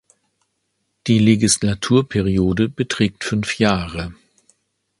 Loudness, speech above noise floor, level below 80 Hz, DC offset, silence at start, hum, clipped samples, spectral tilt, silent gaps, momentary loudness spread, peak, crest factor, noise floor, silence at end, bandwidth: -18 LUFS; 54 dB; -40 dBFS; under 0.1%; 1.05 s; none; under 0.1%; -5 dB/octave; none; 12 LU; 0 dBFS; 20 dB; -71 dBFS; 0.85 s; 11.5 kHz